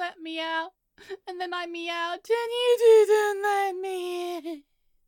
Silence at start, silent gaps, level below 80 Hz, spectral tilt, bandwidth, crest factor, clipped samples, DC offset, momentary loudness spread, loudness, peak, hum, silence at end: 0 s; none; -76 dBFS; -0.5 dB/octave; 17.5 kHz; 16 dB; under 0.1%; under 0.1%; 21 LU; -25 LUFS; -10 dBFS; none; 0.45 s